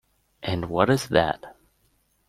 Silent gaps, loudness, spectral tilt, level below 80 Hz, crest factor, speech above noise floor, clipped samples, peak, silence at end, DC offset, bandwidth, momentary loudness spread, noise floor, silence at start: none; -24 LUFS; -5.5 dB/octave; -52 dBFS; 24 dB; 44 dB; under 0.1%; -2 dBFS; 0.75 s; under 0.1%; 15.5 kHz; 13 LU; -67 dBFS; 0.4 s